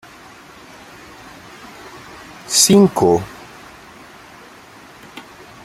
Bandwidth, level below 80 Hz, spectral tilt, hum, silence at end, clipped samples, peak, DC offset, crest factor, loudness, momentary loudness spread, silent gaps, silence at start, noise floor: 15.5 kHz; -54 dBFS; -4 dB/octave; none; 0.45 s; under 0.1%; 0 dBFS; under 0.1%; 20 dB; -13 LUFS; 29 LU; none; 1.85 s; -42 dBFS